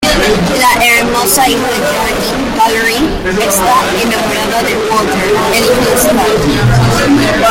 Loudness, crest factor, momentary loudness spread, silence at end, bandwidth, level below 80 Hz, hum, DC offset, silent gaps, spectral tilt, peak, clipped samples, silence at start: -10 LUFS; 10 dB; 4 LU; 0 s; 17 kHz; -26 dBFS; none; under 0.1%; none; -4 dB/octave; 0 dBFS; under 0.1%; 0 s